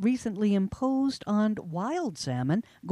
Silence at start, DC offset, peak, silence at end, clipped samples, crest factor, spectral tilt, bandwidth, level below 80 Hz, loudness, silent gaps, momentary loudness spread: 0 s; under 0.1%; -16 dBFS; 0 s; under 0.1%; 12 dB; -6.5 dB/octave; 11.5 kHz; -58 dBFS; -29 LUFS; none; 5 LU